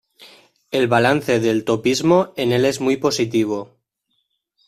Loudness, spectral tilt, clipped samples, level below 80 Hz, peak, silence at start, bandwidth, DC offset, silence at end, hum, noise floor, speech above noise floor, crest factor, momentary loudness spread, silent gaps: -18 LUFS; -5 dB/octave; under 0.1%; -56 dBFS; -2 dBFS; 0.2 s; 14.5 kHz; under 0.1%; 1.05 s; none; -71 dBFS; 54 dB; 16 dB; 5 LU; none